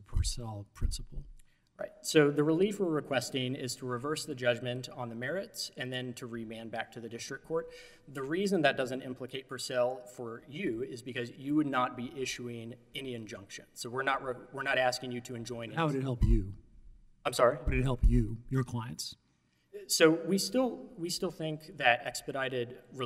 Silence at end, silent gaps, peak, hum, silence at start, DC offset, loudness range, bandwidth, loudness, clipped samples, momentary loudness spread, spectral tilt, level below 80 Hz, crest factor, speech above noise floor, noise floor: 0 s; none; -8 dBFS; none; 0 s; under 0.1%; 6 LU; 16 kHz; -33 LUFS; under 0.1%; 15 LU; -4.5 dB/octave; -42 dBFS; 24 dB; 39 dB; -72 dBFS